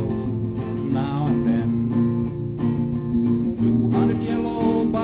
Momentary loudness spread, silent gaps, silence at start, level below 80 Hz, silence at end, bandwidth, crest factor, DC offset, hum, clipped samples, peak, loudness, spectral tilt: 6 LU; none; 0 s; -42 dBFS; 0 s; 4 kHz; 12 dB; under 0.1%; none; under 0.1%; -8 dBFS; -22 LUFS; -13 dB/octave